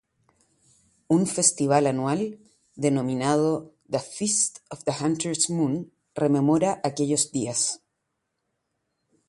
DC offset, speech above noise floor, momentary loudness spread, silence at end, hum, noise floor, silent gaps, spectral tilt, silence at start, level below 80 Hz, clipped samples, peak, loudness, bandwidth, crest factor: under 0.1%; 55 dB; 10 LU; 1.5 s; none; -79 dBFS; none; -4.5 dB/octave; 1.1 s; -66 dBFS; under 0.1%; -4 dBFS; -24 LUFS; 11.5 kHz; 22 dB